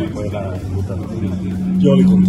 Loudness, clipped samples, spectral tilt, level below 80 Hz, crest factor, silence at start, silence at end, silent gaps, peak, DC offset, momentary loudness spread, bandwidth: -18 LUFS; under 0.1%; -9 dB/octave; -38 dBFS; 16 dB; 0 s; 0 s; none; 0 dBFS; under 0.1%; 11 LU; 8 kHz